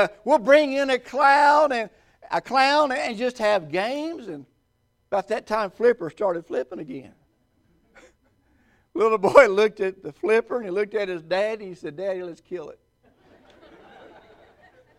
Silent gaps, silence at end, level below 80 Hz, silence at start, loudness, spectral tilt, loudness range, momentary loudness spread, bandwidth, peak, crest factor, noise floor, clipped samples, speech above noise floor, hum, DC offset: none; 2.25 s; -62 dBFS; 0 s; -22 LUFS; -4.5 dB/octave; 10 LU; 20 LU; 12.5 kHz; 0 dBFS; 24 dB; -69 dBFS; under 0.1%; 47 dB; none; under 0.1%